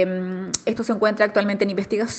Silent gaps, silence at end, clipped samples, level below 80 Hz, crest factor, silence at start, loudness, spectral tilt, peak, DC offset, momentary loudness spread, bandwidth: none; 0 s; under 0.1%; -60 dBFS; 20 dB; 0 s; -22 LUFS; -4.5 dB/octave; -2 dBFS; under 0.1%; 7 LU; 9 kHz